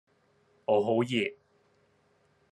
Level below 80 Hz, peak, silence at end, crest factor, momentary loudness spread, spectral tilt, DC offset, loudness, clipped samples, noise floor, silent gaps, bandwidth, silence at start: -76 dBFS; -14 dBFS; 1.2 s; 20 dB; 10 LU; -6 dB/octave; under 0.1%; -29 LUFS; under 0.1%; -68 dBFS; none; 11.5 kHz; 0.7 s